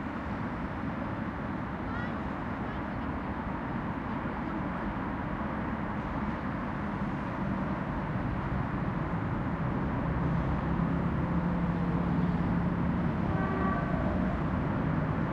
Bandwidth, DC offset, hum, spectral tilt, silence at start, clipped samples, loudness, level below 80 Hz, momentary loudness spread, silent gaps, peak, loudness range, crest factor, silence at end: 6.4 kHz; under 0.1%; none; -9.5 dB/octave; 0 s; under 0.1%; -32 LUFS; -42 dBFS; 5 LU; none; -16 dBFS; 5 LU; 14 dB; 0 s